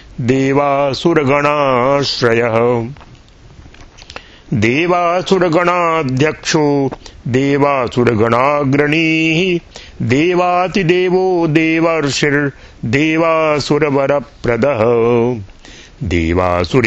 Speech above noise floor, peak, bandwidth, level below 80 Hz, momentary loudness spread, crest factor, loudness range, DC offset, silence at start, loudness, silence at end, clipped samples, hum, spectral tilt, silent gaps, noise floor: 27 dB; 0 dBFS; 8.4 kHz; -38 dBFS; 7 LU; 14 dB; 3 LU; under 0.1%; 0.1 s; -14 LUFS; 0 s; under 0.1%; none; -6 dB/octave; none; -40 dBFS